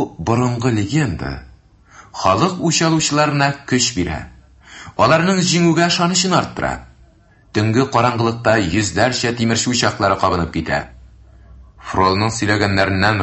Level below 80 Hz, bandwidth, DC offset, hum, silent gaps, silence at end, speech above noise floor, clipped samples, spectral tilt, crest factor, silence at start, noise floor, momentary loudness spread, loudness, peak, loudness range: -38 dBFS; 8.6 kHz; under 0.1%; none; none; 0 s; 33 dB; under 0.1%; -4.5 dB/octave; 18 dB; 0 s; -50 dBFS; 10 LU; -16 LUFS; 0 dBFS; 2 LU